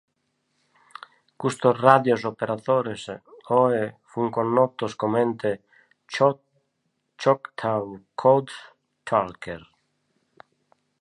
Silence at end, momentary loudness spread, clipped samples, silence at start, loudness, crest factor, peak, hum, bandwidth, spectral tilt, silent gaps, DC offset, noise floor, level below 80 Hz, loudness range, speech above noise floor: 1.4 s; 20 LU; under 0.1%; 1.4 s; -23 LUFS; 24 dB; 0 dBFS; none; 11 kHz; -6.5 dB/octave; none; under 0.1%; -75 dBFS; -66 dBFS; 4 LU; 52 dB